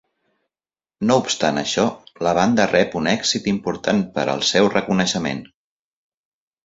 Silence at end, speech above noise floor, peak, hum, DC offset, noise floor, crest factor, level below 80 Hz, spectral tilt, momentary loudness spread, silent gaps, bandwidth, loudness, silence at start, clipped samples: 1.2 s; over 71 dB; -2 dBFS; none; under 0.1%; under -90 dBFS; 20 dB; -54 dBFS; -4 dB/octave; 7 LU; none; 7.8 kHz; -19 LUFS; 1 s; under 0.1%